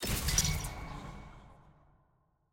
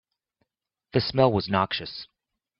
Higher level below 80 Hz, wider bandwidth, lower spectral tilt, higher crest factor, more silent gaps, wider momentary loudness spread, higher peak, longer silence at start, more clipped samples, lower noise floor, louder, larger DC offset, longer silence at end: first, -42 dBFS vs -58 dBFS; first, 17 kHz vs 6 kHz; second, -2.5 dB/octave vs -9 dB/octave; about the same, 22 dB vs 22 dB; neither; first, 22 LU vs 14 LU; second, -14 dBFS vs -4 dBFS; second, 0 s vs 0.95 s; neither; second, -73 dBFS vs -81 dBFS; second, -33 LUFS vs -25 LUFS; neither; first, 0.85 s vs 0.55 s